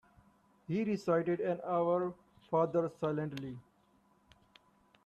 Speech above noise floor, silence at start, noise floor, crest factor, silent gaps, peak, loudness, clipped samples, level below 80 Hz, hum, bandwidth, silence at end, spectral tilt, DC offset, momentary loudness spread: 36 dB; 0.7 s; -70 dBFS; 18 dB; none; -18 dBFS; -34 LUFS; under 0.1%; -74 dBFS; none; 12 kHz; 1.45 s; -8 dB/octave; under 0.1%; 12 LU